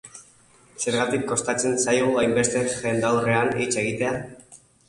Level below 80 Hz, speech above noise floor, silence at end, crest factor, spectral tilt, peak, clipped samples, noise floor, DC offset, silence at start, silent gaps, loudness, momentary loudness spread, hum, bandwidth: -56 dBFS; 32 dB; 0.35 s; 18 dB; -4 dB/octave; -6 dBFS; under 0.1%; -55 dBFS; under 0.1%; 0.05 s; none; -23 LUFS; 7 LU; none; 11.5 kHz